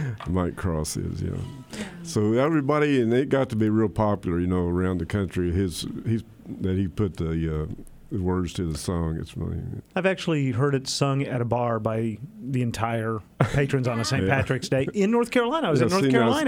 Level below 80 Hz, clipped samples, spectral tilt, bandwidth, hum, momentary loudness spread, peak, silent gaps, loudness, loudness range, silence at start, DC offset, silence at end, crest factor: -44 dBFS; under 0.1%; -6 dB/octave; 16.5 kHz; none; 10 LU; -6 dBFS; none; -25 LUFS; 5 LU; 0 s; under 0.1%; 0 s; 18 dB